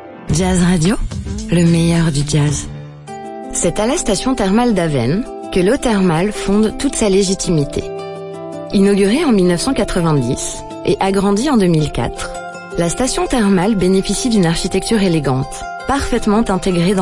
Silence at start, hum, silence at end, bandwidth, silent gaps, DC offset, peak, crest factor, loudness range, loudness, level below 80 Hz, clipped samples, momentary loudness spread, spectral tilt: 0 s; none; 0 s; 11.5 kHz; none; under 0.1%; -4 dBFS; 12 dB; 2 LU; -15 LUFS; -30 dBFS; under 0.1%; 11 LU; -5.5 dB/octave